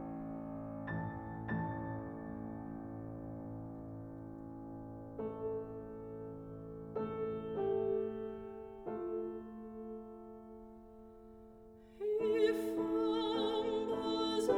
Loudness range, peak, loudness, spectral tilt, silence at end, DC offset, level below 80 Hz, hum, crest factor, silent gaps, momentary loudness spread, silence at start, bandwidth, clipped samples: 10 LU; -20 dBFS; -40 LUFS; -6.5 dB/octave; 0 s; under 0.1%; -62 dBFS; none; 20 dB; none; 18 LU; 0 s; 15 kHz; under 0.1%